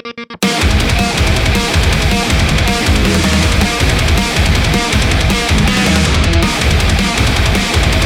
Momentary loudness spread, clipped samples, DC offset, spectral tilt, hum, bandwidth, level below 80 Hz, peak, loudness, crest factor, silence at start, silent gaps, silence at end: 1 LU; under 0.1%; under 0.1%; -4.5 dB/octave; none; 16.5 kHz; -16 dBFS; 0 dBFS; -12 LUFS; 12 dB; 0.05 s; none; 0 s